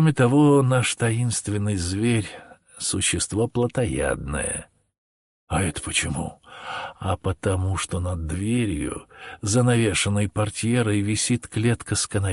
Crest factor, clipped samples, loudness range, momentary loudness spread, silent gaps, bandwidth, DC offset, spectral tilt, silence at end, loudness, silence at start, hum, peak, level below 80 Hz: 16 dB; under 0.1%; 5 LU; 12 LU; 4.98-5.47 s; 11.5 kHz; under 0.1%; -5 dB/octave; 0 s; -23 LUFS; 0 s; none; -8 dBFS; -40 dBFS